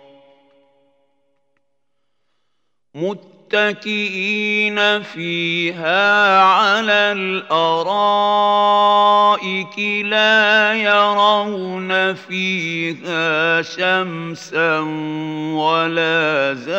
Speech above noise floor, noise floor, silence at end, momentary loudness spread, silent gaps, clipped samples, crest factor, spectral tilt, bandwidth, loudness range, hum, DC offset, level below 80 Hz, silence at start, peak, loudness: 58 dB; -75 dBFS; 0 s; 11 LU; none; under 0.1%; 16 dB; -4.5 dB/octave; 16 kHz; 9 LU; none; under 0.1%; -78 dBFS; 2.95 s; 0 dBFS; -16 LUFS